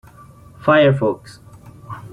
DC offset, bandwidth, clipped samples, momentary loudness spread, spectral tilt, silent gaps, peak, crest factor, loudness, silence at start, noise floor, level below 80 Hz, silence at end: under 0.1%; 11.5 kHz; under 0.1%; 22 LU; -7.5 dB/octave; none; -4 dBFS; 16 dB; -16 LUFS; 0.65 s; -43 dBFS; -52 dBFS; 0 s